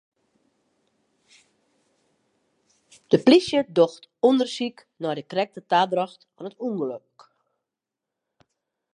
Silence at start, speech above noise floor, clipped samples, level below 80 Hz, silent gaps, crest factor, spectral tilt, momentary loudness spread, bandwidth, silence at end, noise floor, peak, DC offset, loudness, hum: 3.1 s; 64 dB; under 0.1%; -72 dBFS; none; 22 dB; -5.5 dB/octave; 15 LU; 10.5 kHz; 2 s; -87 dBFS; -4 dBFS; under 0.1%; -23 LUFS; none